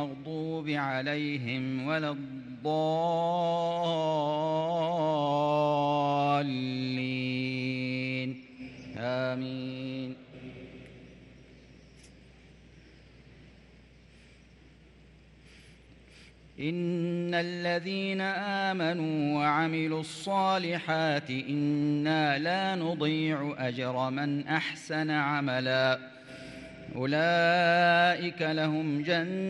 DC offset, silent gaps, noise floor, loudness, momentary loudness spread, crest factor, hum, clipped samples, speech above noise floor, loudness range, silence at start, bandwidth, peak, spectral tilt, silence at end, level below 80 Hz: under 0.1%; none; -56 dBFS; -29 LUFS; 11 LU; 18 dB; none; under 0.1%; 27 dB; 11 LU; 0 s; 11.5 kHz; -14 dBFS; -6.5 dB/octave; 0 s; -66 dBFS